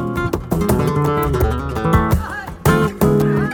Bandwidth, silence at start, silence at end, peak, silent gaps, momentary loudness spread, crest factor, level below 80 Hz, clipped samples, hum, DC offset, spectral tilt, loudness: 19 kHz; 0 s; 0 s; -2 dBFS; none; 5 LU; 14 dB; -26 dBFS; under 0.1%; none; under 0.1%; -7 dB/octave; -17 LUFS